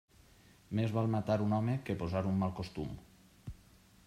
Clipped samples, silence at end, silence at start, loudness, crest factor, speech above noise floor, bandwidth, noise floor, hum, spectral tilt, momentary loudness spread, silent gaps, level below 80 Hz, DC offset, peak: under 0.1%; 0.5 s; 0.7 s; -35 LUFS; 18 dB; 29 dB; 13 kHz; -62 dBFS; none; -8.5 dB/octave; 19 LU; none; -60 dBFS; under 0.1%; -18 dBFS